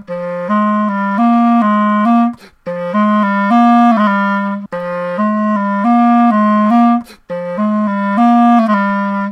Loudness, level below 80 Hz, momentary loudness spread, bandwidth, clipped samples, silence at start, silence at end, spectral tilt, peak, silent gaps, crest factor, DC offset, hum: -12 LUFS; -60 dBFS; 11 LU; 6 kHz; under 0.1%; 0.1 s; 0 s; -8.5 dB/octave; -2 dBFS; none; 10 dB; under 0.1%; none